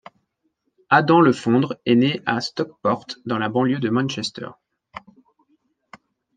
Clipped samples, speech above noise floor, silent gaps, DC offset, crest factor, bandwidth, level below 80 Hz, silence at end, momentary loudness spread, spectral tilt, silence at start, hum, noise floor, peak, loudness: under 0.1%; 52 dB; none; under 0.1%; 20 dB; 9.2 kHz; -66 dBFS; 1.85 s; 22 LU; -6 dB/octave; 0.9 s; none; -72 dBFS; -2 dBFS; -20 LUFS